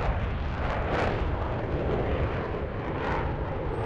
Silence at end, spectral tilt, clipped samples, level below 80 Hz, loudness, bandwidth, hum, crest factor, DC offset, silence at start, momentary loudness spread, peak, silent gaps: 0 s; -8 dB/octave; under 0.1%; -34 dBFS; -30 LUFS; 7.6 kHz; none; 18 dB; under 0.1%; 0 s; 4 LU; -10 dBFS; none